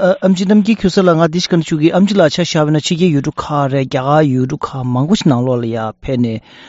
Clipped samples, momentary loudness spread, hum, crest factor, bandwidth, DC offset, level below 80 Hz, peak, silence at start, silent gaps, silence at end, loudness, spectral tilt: under 0.1%; 7 LU; none; 12 dB; 8 kHz; under 0.1%; -42 dBFS; 0 dBFS; 0 s; none; 0.05 s; -14 LUFS; -6 dB/octave